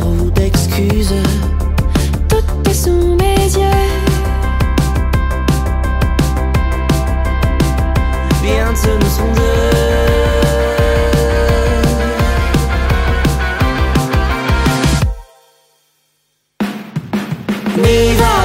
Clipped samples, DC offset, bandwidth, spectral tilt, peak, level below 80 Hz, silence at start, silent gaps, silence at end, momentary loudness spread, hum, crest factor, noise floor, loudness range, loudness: under 0.1%; under 0.1%; 16.5 kHz; -5.5 dB/octave; 0 dBFS; -16 dBFS; 0 s; none; 0 s; 4 LU; none; 12 dB; -63 dBFS; 4 LU; -14 LUFS